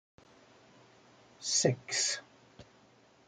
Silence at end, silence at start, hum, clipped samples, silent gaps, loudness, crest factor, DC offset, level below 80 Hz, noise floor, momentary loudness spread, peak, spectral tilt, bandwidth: 0.65 s; 1.4 s; none; under 0.1%; none; -31 LUFS; 24 dB; under 0.1%; -76 dBFS; -63 dBFS; 11 LU; -14 dBFS; -2.5 dB/octave; 11 kHz